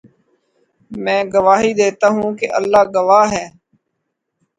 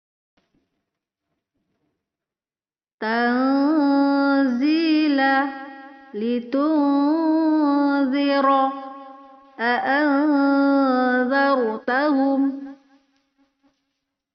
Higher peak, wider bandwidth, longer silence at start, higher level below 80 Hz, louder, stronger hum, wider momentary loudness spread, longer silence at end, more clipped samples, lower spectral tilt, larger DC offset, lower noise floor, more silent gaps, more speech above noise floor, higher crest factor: first, 0 dBFS vs -8 dBFS; first, 9.4 kHz vs 5.8 kHz; second, 0.9 s vs 3 s; first, -54 dBFS vs -74 dBFS; first, -14 LUFS vs -20 LUFS; neither; about the same, 12 LU vs 10 LU; second, 1.1 s vs 1.6 s; neither; first, -4.5 dB/octave vs -2 dB/octave; neither; second, -74 dBFS vs under -90 dBFS; neither; second, 60 dB vs over 71 dB; about the same, 16 dB vs 14 dB